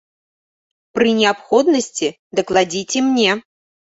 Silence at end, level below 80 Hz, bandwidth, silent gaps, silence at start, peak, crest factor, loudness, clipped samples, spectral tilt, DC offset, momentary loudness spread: 0.6 s; -58 dBFS; 8.2 kHz; 2.19-2.30 s; 0.95 s; -2 dBFS; 16 dB; -17 LUFS; under 0.1%; -3 dB/octave; under 0.1%; 8 LU